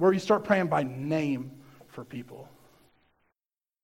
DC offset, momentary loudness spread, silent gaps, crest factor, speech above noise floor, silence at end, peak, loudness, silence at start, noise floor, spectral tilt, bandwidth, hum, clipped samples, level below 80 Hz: under 0.1%; 23 LU; none; 22 dB; over 63 dB; 1.4 s; -8 dBFS; -27 LUFS; 0 s; under -90 dBFS; -7 dB/octave; 16 kHz; none; under 0.1%; -68 dBFS